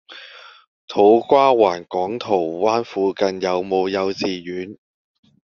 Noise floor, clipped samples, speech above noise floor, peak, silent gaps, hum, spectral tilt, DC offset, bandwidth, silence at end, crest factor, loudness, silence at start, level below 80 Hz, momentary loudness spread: -42 dBFS; under 0.1%; 24 dB; -2 dBFS; 0.67-0.88 s; none; -3.5 dB/octave; under 0.1%; 7 kHz; 0.8 s; 18 dB; -19 LUFS; 0.1 s; -64 dBFS; 16 LU